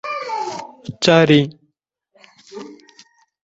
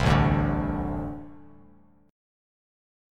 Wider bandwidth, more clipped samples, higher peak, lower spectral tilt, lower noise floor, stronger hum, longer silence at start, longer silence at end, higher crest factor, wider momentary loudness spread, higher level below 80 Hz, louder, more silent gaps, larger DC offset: second, 8.2 kHz vs 10 kHz; neither; first, 0 dBFS vs -8 dBFS; second, -5.5 dB/octave vs -7.5 dB/octave; first, -71 dBFS vs -57 dBFS; neither; about the same, 0.05 s vs 0 s; second, 0.7 s vs 1 s; about the same, 20 dB vs 22 dB; first, 25 LU vs 19 LU; second, -58 dBFS vs -36 dBFS; first, -16 LUFS vs -26 LUFS; neither; neither